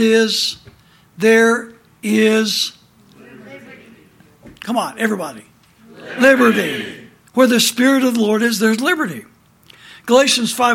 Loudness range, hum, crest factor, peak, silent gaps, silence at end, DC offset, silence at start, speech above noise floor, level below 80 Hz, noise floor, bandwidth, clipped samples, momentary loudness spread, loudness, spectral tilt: 9 LU; none; 16 dB; 0 dBFS; none; 0 s; under 0.1%; 0 s; 33 dB; -62 dBFS; -48 dBFS; 17 kHz; under 0.1%; 15 LU; -15 LUFS; -3 dB/octave